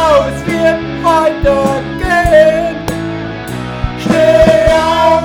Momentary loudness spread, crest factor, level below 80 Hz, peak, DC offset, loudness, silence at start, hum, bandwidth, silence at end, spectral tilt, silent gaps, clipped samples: 13 LU; 10 dB; -26 dBFS; 0 dBFS; under 0.1%; -11 LUFS; 0 s; none; 17.5 kHz; 0 s; -5.5 dB/octave; none; 0.3%